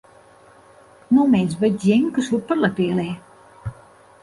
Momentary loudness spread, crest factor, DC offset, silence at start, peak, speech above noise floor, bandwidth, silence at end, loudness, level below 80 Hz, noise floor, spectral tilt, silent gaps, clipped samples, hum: 19 LU; 16 dB; under 0.1%; 1.1 s; -6 dBFS; 31 dB; 11.5 kHz; 0.5 s; -19 LUFS; -54 dBFS; -49 dBFS; -7 dB/octave; none; under 0.1%; none